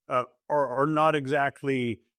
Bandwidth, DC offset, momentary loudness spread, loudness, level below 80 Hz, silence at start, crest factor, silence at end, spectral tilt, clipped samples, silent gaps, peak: 13 kHz; under 0.1%; 6 LU; -26 LUFS; -72 dBFS; 0.1 s; 16 dB; 0.25 s; -6.5 dB/octave; under 0.1%; none; -10 dBFS